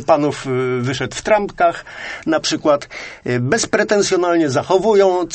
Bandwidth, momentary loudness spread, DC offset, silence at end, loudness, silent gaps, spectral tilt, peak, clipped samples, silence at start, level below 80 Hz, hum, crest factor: 8.8 kHz; 9 LU; under 0.1%; 0 s; -17 LUFS; none; -4.5 dB/octave; 0 dBFS; under 0.1%; 0 s; -48 dBFS; none; 16 dB